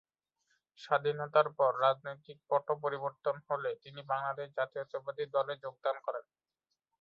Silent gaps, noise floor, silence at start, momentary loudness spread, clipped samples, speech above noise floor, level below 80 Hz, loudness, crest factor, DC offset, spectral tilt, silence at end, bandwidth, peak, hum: none; -88 dBFS; 0.8 s; 11 LU; under 0.1%; 54 dB; -84 dBFS; -34 LUFS; 22 dB; under 0.1%; -6 dB/octave; 0.8 s; 7 kHz; -14 dBFS; none